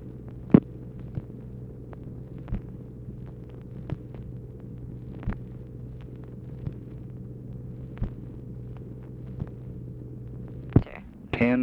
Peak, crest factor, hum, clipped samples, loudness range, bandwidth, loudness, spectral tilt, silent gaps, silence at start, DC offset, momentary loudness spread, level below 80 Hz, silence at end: 0 dBFS; 32 dB; none; under 0.1%; 10 LU; 5.4 kHz; -33 LUFS; -10.5 dB/octave; none; 0 s; under 0.1%; 16 LU; -44 dBFS; 0 s